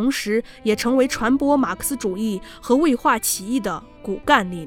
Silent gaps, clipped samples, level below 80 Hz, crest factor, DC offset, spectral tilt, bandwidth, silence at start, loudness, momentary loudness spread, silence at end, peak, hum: none; under 0.1%; -46 dBFS; 18 dB; under 0.1%; -3.5 dB/octave; 18 kHz; 0 s; -20 LUFS; 9 LU; 0 s; -2 dBFS; none